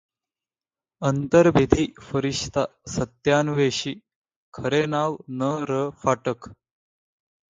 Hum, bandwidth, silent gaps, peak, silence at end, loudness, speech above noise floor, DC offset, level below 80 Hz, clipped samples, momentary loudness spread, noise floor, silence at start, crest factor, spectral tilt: none; 9.4 kHz; 4.16-4.22 s, 4.36-4.52 s; 0 dBFS; 1 s; -23 LUFS; over 67 dB; under 0.1%; -48 dBFS; under 0.1%; 12 LU; under -90 dBFS; 1 s; 24 dB; -5.5 dB/octave